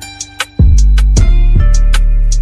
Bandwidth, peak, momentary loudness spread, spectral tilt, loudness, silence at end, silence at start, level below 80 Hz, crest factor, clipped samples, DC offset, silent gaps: 11.5 kHz; 0 dBFS; 9 LU; -5 dB/octave; -12 LUFS; 0 s; 0 s; -8 dBFS; 8 dB; 0.5%; under 0.1%; none